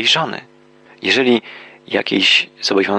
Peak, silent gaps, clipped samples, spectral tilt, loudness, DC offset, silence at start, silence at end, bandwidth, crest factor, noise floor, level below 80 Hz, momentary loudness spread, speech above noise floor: -2 dBFS; none; under 0.1%; -3 dB/octave; -15 LUFS; under 0.1%; 0 s; 0 s; 10 kHz; 16 dB; -47 dBFS; -68 dBFS; 13 LU; 30 dB